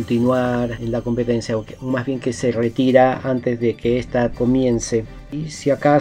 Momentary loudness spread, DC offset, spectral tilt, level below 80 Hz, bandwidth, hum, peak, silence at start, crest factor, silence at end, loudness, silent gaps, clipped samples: 9 LU; under 0.1%; -6.5 dB/octave; -42 dBFS; 10.5 kHz; none; 0 dBFS; 0 s; 18 dB; 0 s; -20 LUFS; none; under 0.1%